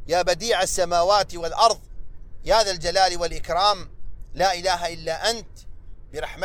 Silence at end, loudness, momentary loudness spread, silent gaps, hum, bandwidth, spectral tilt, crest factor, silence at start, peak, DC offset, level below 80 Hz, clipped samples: 0 s; -22 LUFS; 12 LU; none; none; 16 kHz; -2 dB/octave; 20 dB; 0 s; -4 dBFS; under 0.1%; -38 dBFS; under 0.1%